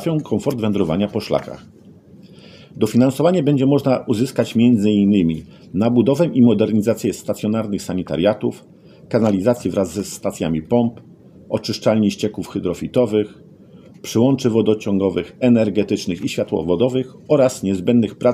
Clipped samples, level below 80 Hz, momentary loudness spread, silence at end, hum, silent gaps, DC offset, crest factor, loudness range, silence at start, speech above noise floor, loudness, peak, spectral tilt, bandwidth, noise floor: under 0.1%; -52 dBFS; 9 LU; 0 s; none; none; under 0.1%; 16 dB; 5 LU; 0 s; 26 dB; -18 LUFS; -2 dBFS; -7 dB/octave; 15 kHz; -44 dBFS